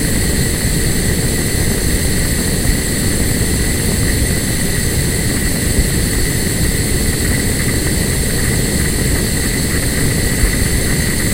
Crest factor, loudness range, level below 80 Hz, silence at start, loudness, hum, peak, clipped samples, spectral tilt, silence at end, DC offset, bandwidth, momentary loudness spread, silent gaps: 14 dB; 0 LU; -20 dBFS; 0 s; -15 LUFS; none; 0 dBFS; under 0.1%; -4 dB/octave; 0 s; 0.6%; 16 kHz; 1 LU; none